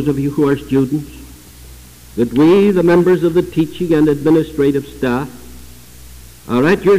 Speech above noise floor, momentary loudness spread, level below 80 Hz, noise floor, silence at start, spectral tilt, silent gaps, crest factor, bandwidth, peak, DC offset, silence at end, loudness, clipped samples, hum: 25 dB; 9 LU; -40 dBFS; -38 dBFS; 0 s; -7.5 dB/octave; none; 10 dB; 16 kHz; -6 dBFS; 0.5%; 0 s; -14 LUFS; under 0.1%; none